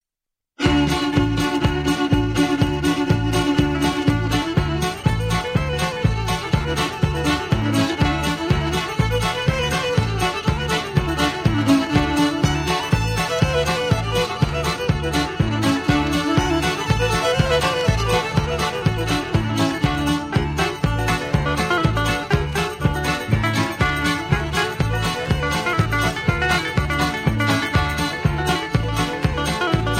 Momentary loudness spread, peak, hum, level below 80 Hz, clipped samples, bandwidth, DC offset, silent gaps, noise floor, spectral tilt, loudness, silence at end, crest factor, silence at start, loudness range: 3 LU; -4 dBFS; none; -30 dBFS; under 0.1%; 16 kHz; under 0.1%; none; -85 dBFS; -5.5 dB/octave; -20 LUFS; 0 s; 16 dB; 0.6 s; 1 LU